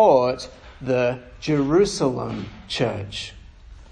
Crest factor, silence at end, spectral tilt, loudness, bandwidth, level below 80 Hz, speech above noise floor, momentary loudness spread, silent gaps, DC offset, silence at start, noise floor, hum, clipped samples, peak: 20 dB; 0.05 s; -5.5 dB/octave; -23 LUFS; 10 kHz; -46 dBFS; 22 dB; 15 LU; none; under 0.1%; 0 s; -43 dBFS; none; under 0.1%; -4 dBFS